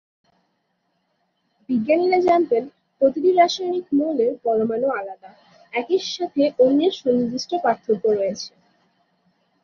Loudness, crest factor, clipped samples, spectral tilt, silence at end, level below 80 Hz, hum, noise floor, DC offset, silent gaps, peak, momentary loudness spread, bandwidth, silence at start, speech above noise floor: -20 LUFS; 18 dB; under 0.1%; -5 dB/octave; 1.15 s; -66 dBFS; none; -71 dBFS; under 0.1%; none; -4 dBFS; 11 LU; 7.2 kHz; 1.7 s; 51 dB